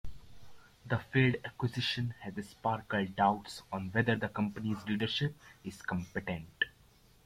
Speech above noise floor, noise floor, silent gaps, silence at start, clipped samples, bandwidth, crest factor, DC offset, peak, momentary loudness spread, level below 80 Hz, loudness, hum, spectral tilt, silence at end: 29 dB; -63 dBFS; none; 0.05 s; under 0.1%; 15.5 kHz; 20 dB; under 0.1%; -14 dBFS; 12 LU; -60 dBFS; -34 LUFS; none; -6 dB/octave; 0.55 s